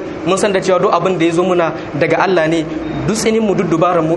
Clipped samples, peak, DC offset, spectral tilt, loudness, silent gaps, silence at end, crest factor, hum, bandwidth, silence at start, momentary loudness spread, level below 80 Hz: under 0.1%; 0 dBFS; under 0.1%; -5.5 dB/octave; -14 LUFS; none; 0 s; 14 dB; none; 11.5 kHz; 0 s; 5 LU; -42 dBFS